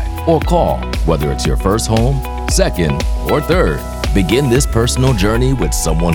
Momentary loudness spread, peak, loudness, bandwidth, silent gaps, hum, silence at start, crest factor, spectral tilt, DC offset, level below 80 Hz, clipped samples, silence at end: 4 LU; 0 dBFS; -15 LUFS; 18.5 kHz; none; none; 0 s; 14 dB; -5.5 dB/octave; under 0.1%; -20 dBFS; under 0.1%; 0 s